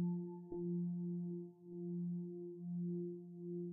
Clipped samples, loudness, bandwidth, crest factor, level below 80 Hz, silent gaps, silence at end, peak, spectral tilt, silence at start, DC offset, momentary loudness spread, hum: under 0.1%; -45 LUFS; 0.9 kHz; 10 dB; -80 dBFS; none; 0 s; -32 dBFS; -11.5 dB/octave; 0 s; under 0.1%; 8 LU; none